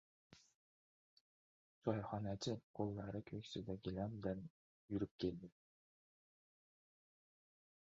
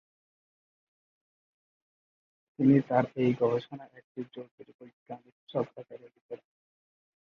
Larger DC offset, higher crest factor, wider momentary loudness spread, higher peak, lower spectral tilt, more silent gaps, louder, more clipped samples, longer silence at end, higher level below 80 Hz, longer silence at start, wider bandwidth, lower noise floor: neither; about the same, 24 dB vs 24 dB; second, 6 LU vs 23 LU; second, -24 dBFS vs -10 dBFS; second, -6.5 dB/octave vs -9.5 dB/octave; first, 0.55-1.82 s, 2.63-2.74 s, 4.50-4.88 s, 5.11-5.19 s vs 4.04-4.15 s, 4.51-4.58 s, 4.74-4.79 s, 4.93-5.06 s, 5.32-5.47 s, 6.21-6.29 s; second, -46 LUFS vs -28 LUFS; neither; first, 2.4 s vs 1.05 s; about the same, -70 dBFS vs -72 dBFS; second, 0.3 s vs 2.6 s; first, 7.4 kHz vs 6.2 kHz; about the same, under -90 dBFS vs under -90 dBFS